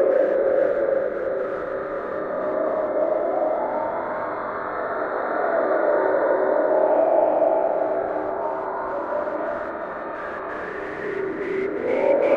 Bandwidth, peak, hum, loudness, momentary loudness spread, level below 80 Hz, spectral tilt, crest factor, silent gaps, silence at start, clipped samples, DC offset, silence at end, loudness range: 5.2 kHz; -8 dBFS; none; -23 LUFS; 10 LU; -58 dBFS; -7.5 dB/octave; 16 dB; none; 0 s; under 0.1%; under 0.1%; 0 s; 7 LU